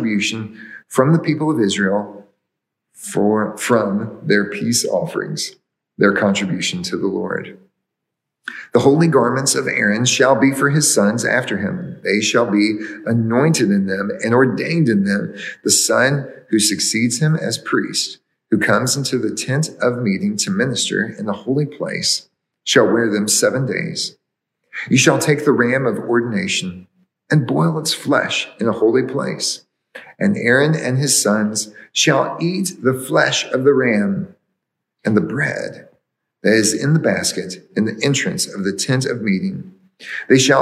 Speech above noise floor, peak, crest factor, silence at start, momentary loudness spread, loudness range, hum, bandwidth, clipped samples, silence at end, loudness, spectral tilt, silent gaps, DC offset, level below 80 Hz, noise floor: 62 dB; 0 dBFS; 18 dB; 0 s; 10 LU; 4 LU; none; 15 kHz; under 0.1%; 0 s; -17 LUFS; -4 dB/octave; none; under 0.1%; -70 dBFS; -79 dBFS